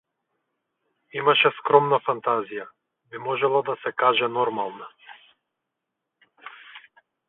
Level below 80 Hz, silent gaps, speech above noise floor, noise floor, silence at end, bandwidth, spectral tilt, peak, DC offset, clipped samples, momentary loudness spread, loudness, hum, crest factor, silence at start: -76 dBFS; none; 60 dB; -83 dBFS; 0.5 s; 4.1 kHz; -8.5 dB/octave; 0 dBFS; under 0.1%; under 0.1%; 24 LU; -22 LUFS; none; 24 dB; 1.15 s